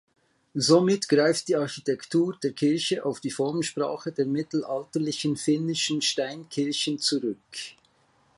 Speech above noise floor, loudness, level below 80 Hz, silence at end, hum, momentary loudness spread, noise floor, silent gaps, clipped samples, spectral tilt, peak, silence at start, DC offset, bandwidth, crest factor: 38 dB; -26 LUFS; -72 dBFS; 0.65 s; none; 9 LU; -64 dBFS; none; under 0.1%; -4.5 dB/octave; -6 dBFS; 0.55 s; under 0.1%; 11.5 kHz; 20 dB